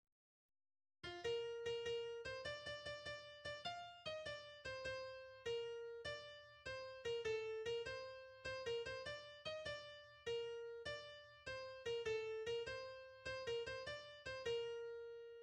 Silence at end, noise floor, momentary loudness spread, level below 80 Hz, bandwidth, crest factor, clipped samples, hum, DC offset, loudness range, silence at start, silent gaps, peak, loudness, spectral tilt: 0 s; under -90 dBFS; 8 LU; -74 dBFS; 10 kHz; 16 dB; under 0.1%; none; under 0.1%; 2 LU; 1.05 s; none; -34 dBFS; -48 LUFS; -3 dB/octave